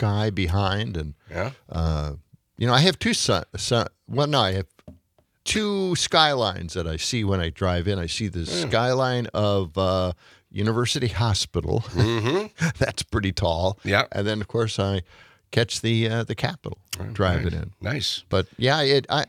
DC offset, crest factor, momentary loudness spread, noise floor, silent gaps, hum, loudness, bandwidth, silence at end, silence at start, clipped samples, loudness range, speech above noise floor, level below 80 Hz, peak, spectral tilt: under 0.1%; 22 dB; 10 LU; -64 dBFS; none; none; -24 LUFS; 15 kHz; 0.05 s; 0 s; under 0.1%; 2 LU; 41 dB; -44 dBFS; -2 dBFS; -4.5 dB/octave